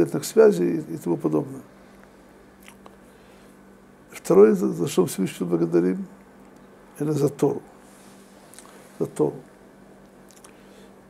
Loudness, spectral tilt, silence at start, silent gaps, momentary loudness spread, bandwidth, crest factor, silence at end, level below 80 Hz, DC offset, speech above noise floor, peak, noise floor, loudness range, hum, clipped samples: -22 LUFS; -6.5 dB/octave; 0 s; none; 22 LU; 15.5 kHz; 22 dB; 1.65 s; -64 dBFS; under 0.1%; 29 dB; -4 dBFS; -50 dBFS; 10 LU; none; under 0.1%